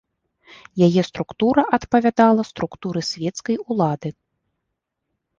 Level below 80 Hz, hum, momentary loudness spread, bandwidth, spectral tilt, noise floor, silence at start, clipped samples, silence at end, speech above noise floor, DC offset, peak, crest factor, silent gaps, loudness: -56 dBFS; none; 12 LU; 7.6 kHz; -6.5 dB/octave; -79 dBFS; 0.75 s; under 0.1%; 1.3 s; 60 dB; under 0.1%; -2 dBFS; 20 dB; none; -20 LUFS